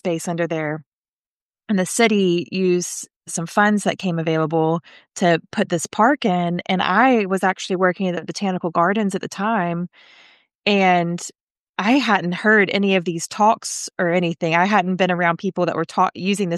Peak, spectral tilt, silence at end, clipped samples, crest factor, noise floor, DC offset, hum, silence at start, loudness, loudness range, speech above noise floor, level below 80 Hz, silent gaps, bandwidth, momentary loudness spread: -2 dBFS; -5 dB/octave; 0 s; under 0.1%; 18 dB; under -90 dBFS; under 0.1%; none; 0.05 s; -19 LUFS; 3 LU; over 71 dB; -70 dBFS; 0.86-1.50 s, 3.16-3.21 s, 10.55-10.62 s, 11.41-11.74 s; 12.5 kHz; 9 LU